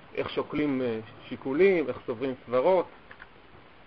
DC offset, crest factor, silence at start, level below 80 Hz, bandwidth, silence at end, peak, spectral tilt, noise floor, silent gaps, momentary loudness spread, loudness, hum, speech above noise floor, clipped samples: 0.1%; 18 dB; 0.15 s; -62 dBFS; 5.2 kHz; 0.6 s; -10 dBFS; -9 dB/octave; -53 dBFS; none; 14 LU; -28 LUFS; none; 26 dB; under 0.1%